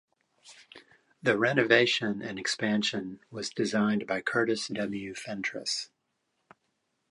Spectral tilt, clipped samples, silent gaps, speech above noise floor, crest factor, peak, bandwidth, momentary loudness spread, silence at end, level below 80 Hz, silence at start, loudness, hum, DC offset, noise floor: -4 dB/octave; under 0.1%; none; 49 dB; 24 dB; -6 dBFS; 11.5 kHz; 14 LU; 1.25 s; -72 dBFS; 0.45 s; -29 LUFS; none; under 0.1%; -79 dBFS